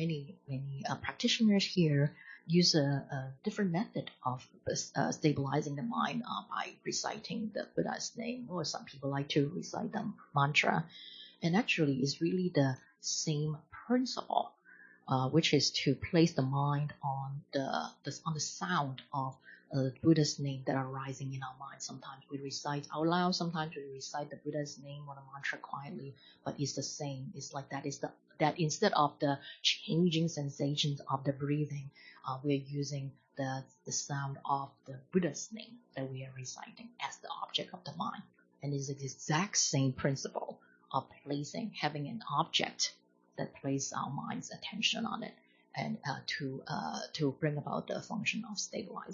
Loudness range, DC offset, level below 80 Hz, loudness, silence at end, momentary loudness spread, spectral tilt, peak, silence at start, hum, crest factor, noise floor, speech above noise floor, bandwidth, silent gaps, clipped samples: 7 LU; under 0.1%; -72 dBFS; -35 LUFS; 0 s; 14 LU; -4.5 dB/octave; -12 dBFS; 0 s; none; 22 dB; -60 dBFS; 25 dB; 7.4 kHz; none; under 0.1%